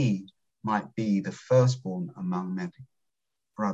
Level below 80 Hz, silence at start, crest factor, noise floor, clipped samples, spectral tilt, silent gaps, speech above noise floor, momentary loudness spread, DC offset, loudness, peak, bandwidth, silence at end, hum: -68 dBFS; 0 s; 18 dB; -86 dBFS; under 0.1%; -7.5 dB/octave; none; 59 dB; 13 LU; under 0.1%; -29 LUFS; -10 dBFS; 8 kHz; 0 s; none